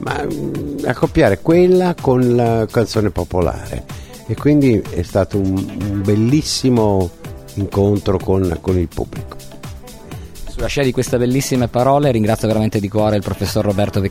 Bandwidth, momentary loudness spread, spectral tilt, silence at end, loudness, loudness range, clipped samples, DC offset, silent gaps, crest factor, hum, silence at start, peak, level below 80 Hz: 16.5 kHz; 18 LU; -6.5 dB/octave; 0 s; -16 LUFS; 5 LU; under 0.1%; under 0.1%; none; 16 dB; none; 0 s; 0 dBFS; -34 dBFS